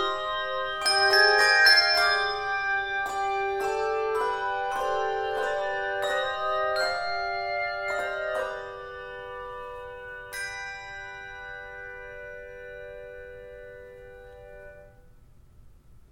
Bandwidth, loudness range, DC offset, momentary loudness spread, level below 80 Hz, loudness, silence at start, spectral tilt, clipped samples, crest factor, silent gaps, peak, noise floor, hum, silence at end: 17 kHz; 21 LU; under 0.1%; 24 LU; -54 dBFS; -25 LUFS; 0 s; -1 dB/octave; under 0.1%; 22 dB; none; -6 dBFS; -53 dBFS; none; 0.15 s